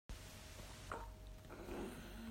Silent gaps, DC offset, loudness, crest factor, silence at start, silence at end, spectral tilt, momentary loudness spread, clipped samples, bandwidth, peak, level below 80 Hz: none; under 0.1%; -52 LUFS; 20 dB; 0.1 s; 0 s; -4.5 dB/octave; 6 LU; under 0.1%; 16 kHz; -32 dBFS; -56 dBFS